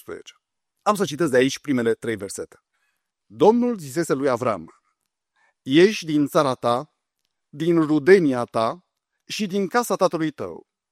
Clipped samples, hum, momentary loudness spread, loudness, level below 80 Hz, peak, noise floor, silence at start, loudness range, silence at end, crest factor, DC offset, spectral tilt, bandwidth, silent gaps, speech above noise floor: under 0.1%; none; 16 LU; -21 LUFS; -66 dBFS; -2 dBFS; -79 dBFS; 0.1 s; 4 LU; 0.35 s; 20 dB; under 0.1%; -5.5 dB/octave; 15.5 kHz; none; 58 dB